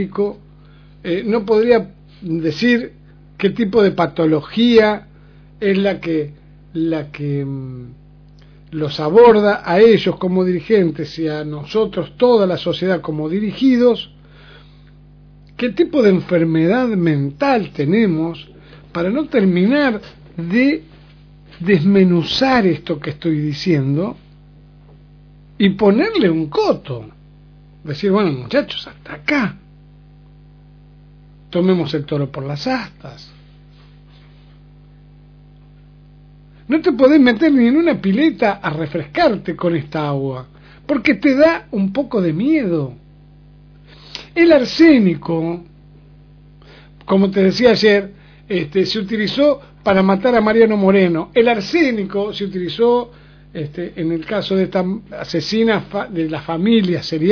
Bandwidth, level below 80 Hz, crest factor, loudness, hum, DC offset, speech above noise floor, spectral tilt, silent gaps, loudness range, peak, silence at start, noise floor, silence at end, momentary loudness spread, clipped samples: 5.4 kHz; -48 dBFS; 16 dB; -16 LUFS; 50 Hz at -40 dBFS; under 0.1%; 28 dB; -7.5 dB/octave; none; 7 LU; 0 dBFS; 0 s; -44 dBFS; 0 s; 13 LU; under 0.1%